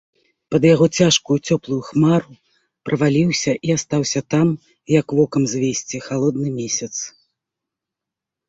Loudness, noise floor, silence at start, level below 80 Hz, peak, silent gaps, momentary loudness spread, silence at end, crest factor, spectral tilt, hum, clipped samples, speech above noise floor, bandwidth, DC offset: -18 LUFS; -85 dBFS; 0.5 s; -54 dBFS; -2 dBFS; none; 11 LU; 1.4 s; 18 dB; -5 dB/octave; none; under 0.1%; 67 dB; 8 kHz; under 0.1%